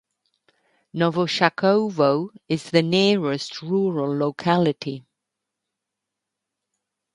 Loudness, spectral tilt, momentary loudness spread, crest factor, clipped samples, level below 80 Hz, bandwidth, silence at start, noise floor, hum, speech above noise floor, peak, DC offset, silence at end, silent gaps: -21 LUFS; -6 dB/octave; 10 LU; 20 dB; under 0.1%; -68 dBFS; 11 kHz; 0.95 s; -84 dBFS; none; 63 dB; -2 dBFS; under 0.1%; 2.15 s; none